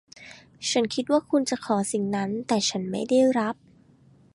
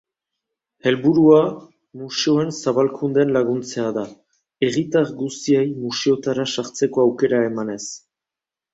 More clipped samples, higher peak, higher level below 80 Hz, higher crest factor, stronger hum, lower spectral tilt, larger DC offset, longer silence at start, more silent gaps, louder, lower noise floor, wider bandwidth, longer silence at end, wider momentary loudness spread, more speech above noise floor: neither; second, -10 dBFS vs -2 dBFS; about the same, -66 dBFS vs -62 dBFS; about the same, 16 dB vs 18 dB; neither; second, -4 dB/octave vs -5.5 dB/octave; neither; second, 0.2 s vs 0.85 s; neither; second, -25 LUFS vs -19 LUFS; second, -56 dBFS vs -88 dBFS; first, 11.5 kHz vs 8 kHz; about the same, 0.8 s vs 0.75 s; first, 15 LU vs 12 LU; second, 32 dB vs 69 dB